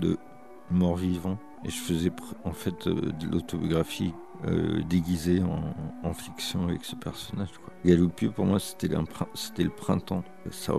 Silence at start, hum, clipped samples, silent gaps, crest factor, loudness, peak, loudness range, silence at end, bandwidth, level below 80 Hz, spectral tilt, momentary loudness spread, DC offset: 0 s; none; under 0.1%; none; 22 dB; -29 LUFS; -8 dBFS; 2 LU; 0 s; 14 kHz; -54 dBFS; -6.5 dB/octave; 10 LU; 0.4%